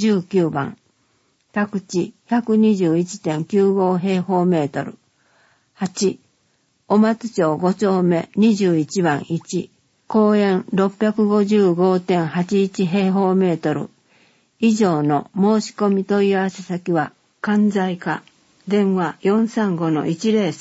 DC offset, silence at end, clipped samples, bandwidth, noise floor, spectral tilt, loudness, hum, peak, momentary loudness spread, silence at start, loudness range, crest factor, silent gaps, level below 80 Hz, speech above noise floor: under 0.1%; 0 s; under 0.1%; 8 kHz; -64 dBFS; -6.5 dB/octave; -19 LUFS; none; -4 dBFS; 10 LU; 0 s; 3 LU; 14 dB; none; -64 dBFS; 46 dB